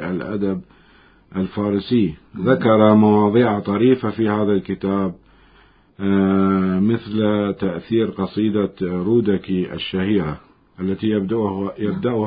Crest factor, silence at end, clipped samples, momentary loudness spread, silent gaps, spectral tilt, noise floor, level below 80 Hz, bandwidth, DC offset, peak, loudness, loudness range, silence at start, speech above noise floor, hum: 18 dB; 0 s; under 0.1%; 10 LU; none; -12.5 dB/octave; -52 dBFS; -48 dBFS; 5 kHz; under 0.1%; 0 dBFS; -19 LUFS; 5 LU; 0 s; 34 dB; none